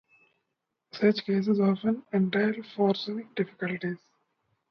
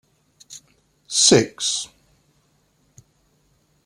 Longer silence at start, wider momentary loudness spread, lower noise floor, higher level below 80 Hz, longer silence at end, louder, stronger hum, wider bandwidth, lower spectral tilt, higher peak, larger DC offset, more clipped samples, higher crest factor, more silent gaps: first, 0.95 s vs 0.5 s; second, 9 LU vs 28 LU; first, -82 dBFS vs -63 dBFS; second, -74 dBFS vs -60 dBFS; second, 0.75 s vs 2 s; second, -28 LUFS vs -17 LUFS; neither; second, 6.2 kHz vs 15.5 kHz; first, -8 dB/octave vs -2.5 dB/octave; second, -10 dBFS vs -2 dBFS; neither; neither; second, 18 dB vs 24 dB; neither